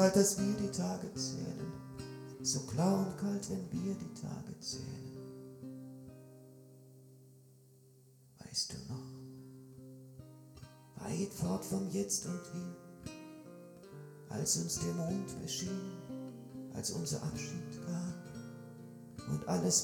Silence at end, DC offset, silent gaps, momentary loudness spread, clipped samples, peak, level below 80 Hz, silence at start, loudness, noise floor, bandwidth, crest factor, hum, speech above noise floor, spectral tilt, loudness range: 0 s; under 0.1%; none; 21 LU; under 0.1%; -16 dBFS; -66 dBFS; 0 s; -38 LUFS; -63 dBFS; 18.5 kHz; 24 dB; none; 26 dB; -4.5 dB/octave; 9 LU